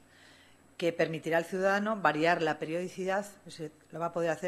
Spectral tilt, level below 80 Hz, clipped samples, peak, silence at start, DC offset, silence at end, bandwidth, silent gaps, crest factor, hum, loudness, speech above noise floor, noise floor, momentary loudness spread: -5 dB/octave; -76 dBFS; under 0.1%; -12 dBFS; 0.8 s; under 0.1%; 0 s; 14.5 kHz; none; 20 dB; none; -31 LUFS; 28 dB; -59 dBFS; 16 LU